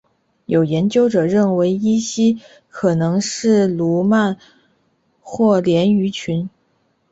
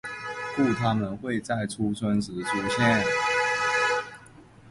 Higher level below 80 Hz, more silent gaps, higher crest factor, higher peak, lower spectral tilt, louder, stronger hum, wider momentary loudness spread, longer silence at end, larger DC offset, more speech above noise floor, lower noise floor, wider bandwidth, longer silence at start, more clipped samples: about the same, -56 dBFS vs -56 dBFS; neither; about the same, 14 dB vs 18 dB; first, -4 dBFS vs -10 dBFS; about the same, -6 dB/octave vs -5 dB/octave; first, -17 LUFS vs -26 LUFS; neither; about the same, 9 LU vs 9 LU; first, 0.65 s vs 0 s; neither; first, 47 dB vs 25 dB; first, -63 dBFS vs -50 dBFS; second, 8 kHz vs 11.5 kHz; first, 0.5 s vs 0.05 s; neither